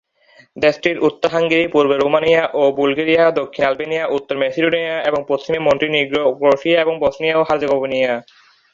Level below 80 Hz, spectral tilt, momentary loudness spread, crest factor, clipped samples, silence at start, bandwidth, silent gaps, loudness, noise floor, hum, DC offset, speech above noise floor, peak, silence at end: -54 dBFS; -5.5 dB/octave; 6 LU; 16 dB; under 0.1%; 0.55 s; 7.4 kHz; none; -16 LUFS; -51 dBFS; none; under 0.1%; 35 dB; 0 dBFS; 0.5 s